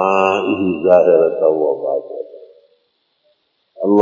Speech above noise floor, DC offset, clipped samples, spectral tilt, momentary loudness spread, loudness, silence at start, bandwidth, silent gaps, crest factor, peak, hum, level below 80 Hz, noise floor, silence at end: 51 dB; under 0.1%; under 0.1%; -7 dB/octave; 16 LU; -15 LUFS; 0 s; 7.4 kHz; none; 16 dB; 0 dBFS; none; -56 dBFS; -65 dBFS; 0 s